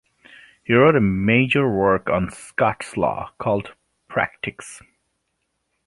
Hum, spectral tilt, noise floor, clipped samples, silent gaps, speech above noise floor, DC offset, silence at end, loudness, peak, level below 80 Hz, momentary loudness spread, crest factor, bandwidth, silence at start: none; -6.5 dB/octave; -74 dBFS; under 0.1%; none; 54 dB; under 0.1%; 1.1 s; -20 LUFS; -2 dBFS; -48 dBFS; 15 LU; 20 dB; 11.5 kHz; 0.7 s